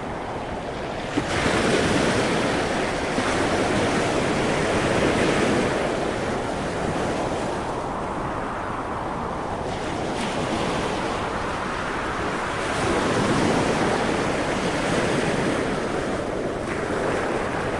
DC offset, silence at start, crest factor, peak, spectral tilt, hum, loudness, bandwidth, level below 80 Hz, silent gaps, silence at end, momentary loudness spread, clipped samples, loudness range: under 0.1%; 0 s; 16 dB; -8 dBFS; -5 dB/octave; none; -24 LUFS; 11.5 kHz; -42 dBFS; none; 0 s; 7 LU; under 0.1%; 5 LU